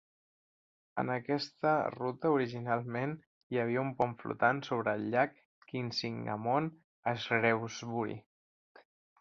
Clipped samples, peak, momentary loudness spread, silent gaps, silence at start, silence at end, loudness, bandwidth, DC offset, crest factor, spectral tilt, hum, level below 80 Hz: under 0.1%; -14 dBFS; 9 LU; 3.27-3.50 s, 5.45-5.62 s, 6.84-7.03 s; 0.95 s; 1 s; -34 LUFS; 7.4 kHz; under 0.1%; 22 dB; -4.5 dB/octave; none; -74 dBFS